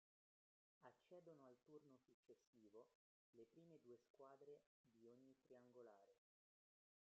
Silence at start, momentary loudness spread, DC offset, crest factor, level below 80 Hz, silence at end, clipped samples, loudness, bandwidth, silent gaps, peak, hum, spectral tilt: 0.8 s; 3 LU; under 0.1%; 20 dB; under -90 dBFS; 0.85 s; under 0.1%; -68 LUFS; 6.6 kHz; 2.14-2.23 s, 2.47-2.53 s, 2.95-3.33 s, 4.10-4.14 s, 4.66-4.84 s; -50 dBFS; none; -6 dB/octave